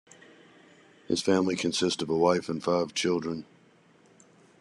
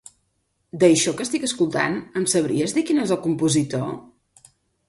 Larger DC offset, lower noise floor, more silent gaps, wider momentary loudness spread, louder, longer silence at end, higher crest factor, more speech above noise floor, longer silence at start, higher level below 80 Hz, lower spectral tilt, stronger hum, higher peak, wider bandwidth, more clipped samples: neither; second, -60 dBFS vs -71 dBFS; neither; second, 6 LU vs 10 LU; second, -28 LUFS vs -21 LUFS; first, 1.15 s vs 0.85 s; about the same, 20 dB vs 20 dB; second, 33 dB vs 50 dB; first, 1.1 s vs 0.75 s; second, -66 dBFS vs -60 dBFS; about the same, -4.5 dB/octave vs -4.5 dB/octave; neither; second, -10 dBFS vs -4 dBFS; about the same, 12 kHz vs 11.5 kHz; neither